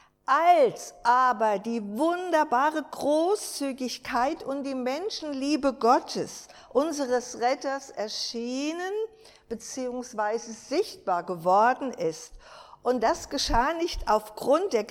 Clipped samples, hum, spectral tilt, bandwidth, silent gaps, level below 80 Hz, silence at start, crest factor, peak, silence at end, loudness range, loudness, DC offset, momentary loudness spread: under 0.1%; none; -3.5 dB/octave; 16.5 kHz; none; -48 dBFS; 0.3 s; 18 dB; -8 dBFS; 0 s; 6 LU; -27 LUFS; under 0.1%; 11 LU